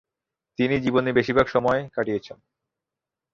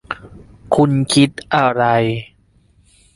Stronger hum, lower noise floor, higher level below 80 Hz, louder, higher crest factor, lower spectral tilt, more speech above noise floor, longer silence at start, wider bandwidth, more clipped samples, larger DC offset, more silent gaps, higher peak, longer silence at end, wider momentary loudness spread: neither; first, -88 dBFS vs -54 dBFS; second, -54 dBFS vs -48 dBFS; second, -23 LUFS vs -16 LUFS; about the same, 20 dB vs 16 dB; first, -7 dB/octave vs -5.5 dB/octave; first, 65 dB vs 39 dB; first, 0.6 s vs 0.1 s; second, 7.2 kHz vs 11.5 kHz; neither; neither; neither; second, -6 dBFS vs 0 dBFS; about the same, 1 s vs 0.9 s; second, 8 LU vs 14 LU